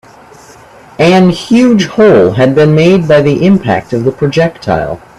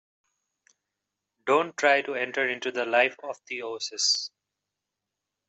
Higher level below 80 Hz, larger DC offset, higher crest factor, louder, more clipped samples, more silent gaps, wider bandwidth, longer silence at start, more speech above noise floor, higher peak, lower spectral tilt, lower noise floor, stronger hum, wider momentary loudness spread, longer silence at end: first, -40 dBFS vs -84 dBFS; neither; second, 8 dB vs 22 dB; first, -8 LUFS vs -26 LUFS; neither; neither; first, 12 kHz vs 8.2 kHz; second, 1 s vs 1.45 s; second, 28 dB vs 59 dB; first, 0 dBFS vs -8 dBFS; first, -7 dB/octave vs -1 dB/octave; second, -36 dBFS vs -86 dBFS; neither; second, 7 LU vs 12 LU; second, 0.2 s vs 1.2 s